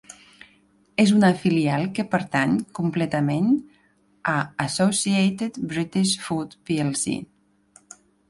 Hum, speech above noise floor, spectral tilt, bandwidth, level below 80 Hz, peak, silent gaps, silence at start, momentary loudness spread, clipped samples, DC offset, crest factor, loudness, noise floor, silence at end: none; 39 dB; -5 dB/octave; 11.5 kHz; -60 dBFS; -6 dBFS; none; 0.1 s; 9 LU; under 0.1%; under 0.1%; 18 dB; -23 LUFS; -61 dBFS; 1.05 s